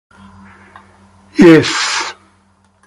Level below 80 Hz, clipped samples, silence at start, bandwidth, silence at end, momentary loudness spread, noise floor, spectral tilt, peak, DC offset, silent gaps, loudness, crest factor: -48 dBFS; 2%; 1.35 s; 11.5 kHz; 0.75 s; 17 LU; -53 dBFS; -4.5 dB/octave; 0 dBFS; under 0.1%; none; -10 LUFS; 14 dB